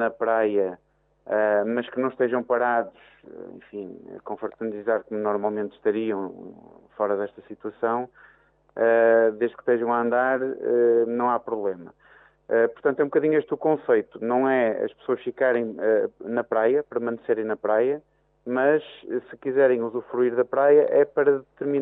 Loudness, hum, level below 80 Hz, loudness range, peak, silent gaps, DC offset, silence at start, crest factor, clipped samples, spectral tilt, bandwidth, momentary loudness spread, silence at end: -24 LUFS; none; -72 dBFS; 7 LU; -6 dBFS; none; under 0.1%; 0 s; 18 dB; under 0.1%; -10 dB/octave; 3.9 kHz; 14 LU; 0 s